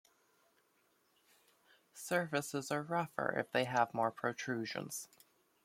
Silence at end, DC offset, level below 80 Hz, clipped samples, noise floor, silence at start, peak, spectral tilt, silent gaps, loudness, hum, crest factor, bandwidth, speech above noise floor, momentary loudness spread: 0.6 s; under 0.1%; -82 dBFS; under 0.1%; -75 dBFS; 1.95 s; -16 dBFS; -4 dB/octave; none; -37 LUFS; none; 22 dB; 16.5 kHz; 38 dB; 11 LU